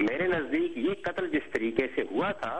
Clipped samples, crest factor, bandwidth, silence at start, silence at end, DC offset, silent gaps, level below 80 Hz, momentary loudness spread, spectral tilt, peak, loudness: under 0.1%; 18 dB; 9 kHz; 0 s; 0 s; 0.4%; none; -58 dBFS; 3 LU; -6.5 dB/octave; -12 dBFS; -30 LUFS